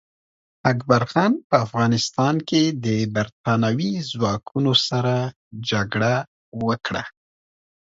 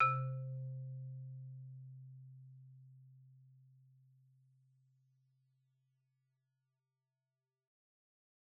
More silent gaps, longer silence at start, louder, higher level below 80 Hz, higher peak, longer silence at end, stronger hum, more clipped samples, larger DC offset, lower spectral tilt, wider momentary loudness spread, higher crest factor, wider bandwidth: first, 1.44-1.50 s, 3.32-3.44 s, 5.36-5.51 s, 6.28-6.52 s vs none; first, 0.65 s vs 0 s; first, -22 LUFS vs -44 LUFS; first, -56 dBFS vs -84 dBFS; first, 0 dBFS vs -20 dBFS; second, 0.75 s vs 4.65 s; neither; neither; neither; first, -5.5 dB/octave vs -3.5 dB/octave; second, 8 LU vs 22 LU; about the same, 22 dB vs 26 dB; first, 7.8 kHz vs 2.5 kHz